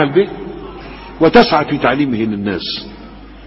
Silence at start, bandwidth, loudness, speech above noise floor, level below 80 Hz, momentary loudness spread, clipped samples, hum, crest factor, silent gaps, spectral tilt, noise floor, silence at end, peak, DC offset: 0 s; 7.4 kHz; -14 LUFS; 21 dB; -40 dBFS; 22 LU; under 0.1%; none; 16 dB; none; -8 dB/octave; -35 dBFS; 0 s; 0 dBFS; under 0.1%